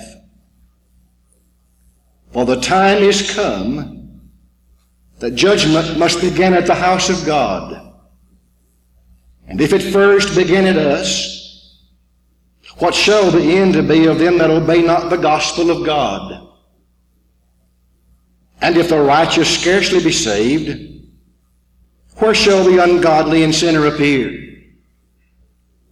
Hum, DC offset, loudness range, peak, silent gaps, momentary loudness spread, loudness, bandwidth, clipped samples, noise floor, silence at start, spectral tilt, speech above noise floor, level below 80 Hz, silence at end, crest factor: 60 Hz at -45 dBFS; under 0.1%; 5 LU; -2 dBFS; none; 13 LU; -13 LUFS; 13 kHz; under 0.1%; -57 dBFS; 0 s; -4.5 dB/octave; 44 dB; -42 dBFS; 1.4 s; 14 dB